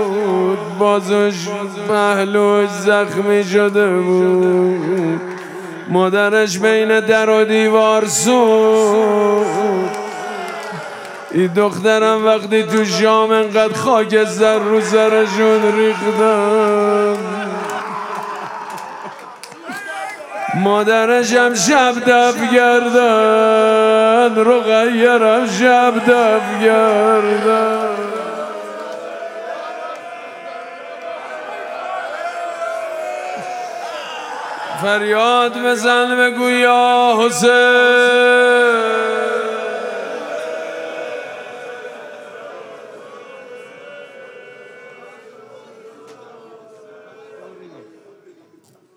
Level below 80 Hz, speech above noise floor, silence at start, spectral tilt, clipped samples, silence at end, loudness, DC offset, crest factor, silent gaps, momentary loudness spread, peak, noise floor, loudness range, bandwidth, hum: -72 dBFS; 39 dB; 0 s; -4 dB/octave; under 0.1%; 1.15 s; -14 LUFS; under 0.1%; 16 dB; none; 17 LU; 0 dBFS; -52 dBFS; 15 LU; 16 kHz; none